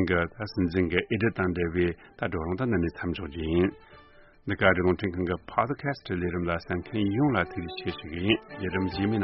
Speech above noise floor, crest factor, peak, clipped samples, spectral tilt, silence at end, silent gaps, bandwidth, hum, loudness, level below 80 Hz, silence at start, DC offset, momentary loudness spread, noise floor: 26 dB; 24 dB; -4 dBFS; under 0.1%; -5 dB/octave; 0 s; none; 5.8 kHz; none; -28 LUFS; -48 dBFS; 0 s; under 0.1%; 8 LU; -54 dBFS